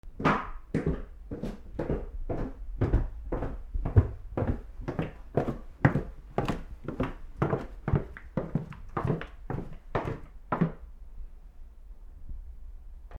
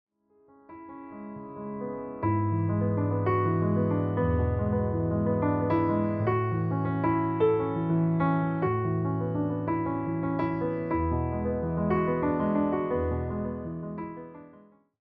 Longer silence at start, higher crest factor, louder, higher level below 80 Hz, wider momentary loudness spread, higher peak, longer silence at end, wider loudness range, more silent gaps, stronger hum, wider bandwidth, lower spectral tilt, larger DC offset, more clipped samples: second, 0.05 s vs 0.7 s; first, 28 dB vs 14 dB; second, -33 LUFS vs -28 LUFS; first, -38 dBFS vs -48 dBFS; first, 22 LU vs 12 LU; first, -4 dBFS vs -14 dBFS; second, 0 s vs 0.45 s; about the same, 5 LU vs 3 LU; neither; neither; first, 10 kHz vs 4.6 kHz; second, -9 dB/octave vs -12.5 dB/octave; neither; neither